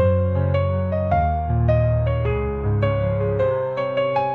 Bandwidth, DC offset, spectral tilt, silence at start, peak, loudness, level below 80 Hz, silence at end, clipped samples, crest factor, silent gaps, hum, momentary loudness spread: 4.5 kHz; 0.2%; -10 dB/octave; 0 s; -8 dBFS; -21 LUFS; -32 dBFS; 0 s; under 0.1%; 12 dB; none; none; 4 LU